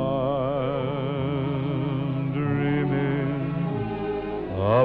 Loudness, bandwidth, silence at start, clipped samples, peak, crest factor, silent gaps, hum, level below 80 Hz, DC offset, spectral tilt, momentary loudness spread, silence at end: -26 LUFS; 4.6 kHz; 0 s; under 0.1%; -10 dBFS; 16 dB; none; none; -48 dBFS; under 0.1%; -10.5 dB/octave; 5 LU; 0 s